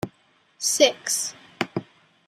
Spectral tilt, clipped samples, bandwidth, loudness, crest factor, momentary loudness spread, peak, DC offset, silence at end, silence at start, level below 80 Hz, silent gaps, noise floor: -1.5 dB/octave; under 0.1%; 15.5 kHz; -23 LUFS; 22 dB; 14 LU; -4 dBFS; under 0.1%; 0.45 s; 0.05 s; -68 dBFS; none; -62 dBFS